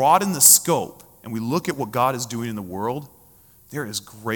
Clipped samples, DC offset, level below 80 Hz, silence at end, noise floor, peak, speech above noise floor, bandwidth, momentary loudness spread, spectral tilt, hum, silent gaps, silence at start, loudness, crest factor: under 0.1%; under 0.1%; -62 dBFS; 0 s; -52 dBFS; 0 dBFS; 31 dB; 18 kHz; 21 LU; -3 dB/octave; none; none; 0 s; -19 LUFS; 22 dB